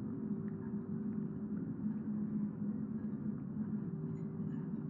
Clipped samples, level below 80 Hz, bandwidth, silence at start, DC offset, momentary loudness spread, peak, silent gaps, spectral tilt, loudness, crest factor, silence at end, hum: under 0.1%; -70 dBFS; 2.2 kHz; 0 s; under 0.1%; 3 LU; -28 dBFS; none; -12.5 dB/octave; -41 LUFS; 12 dB; 0 s; none